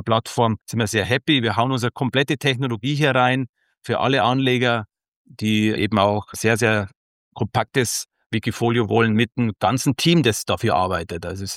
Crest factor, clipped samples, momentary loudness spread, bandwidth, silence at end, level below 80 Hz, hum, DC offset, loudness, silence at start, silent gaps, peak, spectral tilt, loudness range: 18 dB; under 0.1%; 8 LU; 16.5 kHz; 0 s; -54 dBFS; none; under 0.1%; -20 LUFS; 0 s; 3.49-3.53 s, 5.08-5.25 s, 6.95-7.31 s, 8.26-8.30 s; -4 dBFS; -5 dB/octave; 2 LU